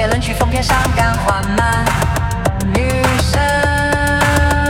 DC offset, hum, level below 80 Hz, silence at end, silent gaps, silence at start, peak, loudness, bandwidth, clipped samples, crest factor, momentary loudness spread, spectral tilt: 0.2%; none; -22 dBFS; 0 s; none; 0 s; 0 dBFS; -15 LUFS; 18 kHz; under 0.1%; 14 dB; 3 LU; -5 dB/octave